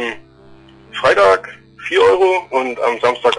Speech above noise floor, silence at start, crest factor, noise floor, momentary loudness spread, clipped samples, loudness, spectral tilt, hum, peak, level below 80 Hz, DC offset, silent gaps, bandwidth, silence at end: 29 dB; 0 s; 12 dB; -43 dBFS; 18 LU; under 0.1%; -14 LUFS; -3.5 dB/octave; none; -4 dBFS; -52 dBFS; under 0.1%; none; 10.5 kHz; 0 s